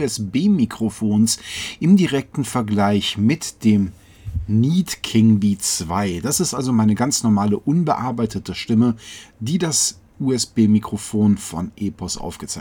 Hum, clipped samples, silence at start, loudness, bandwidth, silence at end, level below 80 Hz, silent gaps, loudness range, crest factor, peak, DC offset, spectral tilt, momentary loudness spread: none; under 0.1%; 0 s; -19 LUFS; 19 kHz; 0 s; -44 dBFS; none; 2 LU; 14 dB; -4 dBFS; under 0.1%; -5 dB/octave; 11 LU